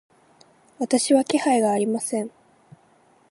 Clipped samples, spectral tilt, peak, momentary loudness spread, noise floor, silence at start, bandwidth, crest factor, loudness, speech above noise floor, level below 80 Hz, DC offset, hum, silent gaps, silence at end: under 0.1%; -4 dB/octave; -6 dBFS; 11 LU; -58 dBFS; 0.8 s; 11.5 kHz; 18 dB; -22 LUFS; 37 dB; -74 dBFS; under 0.1%; none; none; 1.05 s